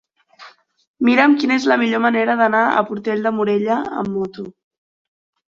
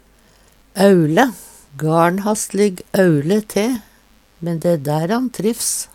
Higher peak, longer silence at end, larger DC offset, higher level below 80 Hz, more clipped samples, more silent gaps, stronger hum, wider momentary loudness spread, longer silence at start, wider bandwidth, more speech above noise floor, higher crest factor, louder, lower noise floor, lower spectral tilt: about the same, -2 dBFS vs 0 dBFS; first, 1 s vs 0.1 s; neither; second, -62 dBFS vs -54 dBFS; neither; first, 0.87-0.94 s vs none; neither; about the same, 10 LU vs 12 LU; second, 0.4 s vs 0.75 s; second, 7.6 kHz vs 17.5 kHz; second, 28 dB vs 36 dB; about the same, 18 dB vs 18 dB; about the same, -17 LUFS vs -17 LUFS; second, -45 dBFS vs -52 dBFS; about the same, -5.5 dB/octave vs -5.5 dB/octave